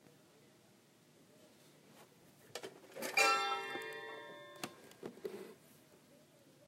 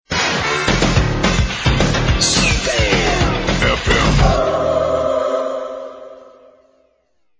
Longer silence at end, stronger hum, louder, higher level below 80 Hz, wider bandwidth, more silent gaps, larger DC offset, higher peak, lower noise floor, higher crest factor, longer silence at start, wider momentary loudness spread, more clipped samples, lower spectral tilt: second, 0.5 s vs 1.15 s; neither; second, -38 LUFS vs -16 LUFS; second, under -90 dBFS vs -24 dBFS; first, 16 kHz vs 8 kHz; neither; neither; second, -18 dBFS vs 0 dBFS; first, -67 dBFS vs -62 dBFS; first, 26 dB vs 16 dB; about the same, 0.05 s vs 0.1 s; first, 22 LU vs 8 LU; neither; second, -1 dB/octave vs -4 dB/octave